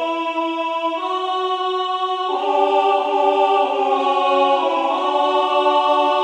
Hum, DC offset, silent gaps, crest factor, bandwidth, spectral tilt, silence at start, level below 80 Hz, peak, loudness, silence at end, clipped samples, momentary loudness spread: none; under 0.1%; none; 14 dB; 9.8 kHz; -2 dB/octave; 0 s; -80 dBFS; -4 dBFS; -18 LUFS; 0 s; under 0.1%; 6 LU